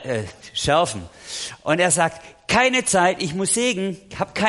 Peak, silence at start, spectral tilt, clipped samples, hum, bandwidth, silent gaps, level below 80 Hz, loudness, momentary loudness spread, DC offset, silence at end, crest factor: -4 dBFS; 0 s; -3 dB/octave; under 0.1%; none; 11.5 kHz; none; -50 dBFS; -20 LUFS; 13 LU; under 0.1%; 0 s; 18 dB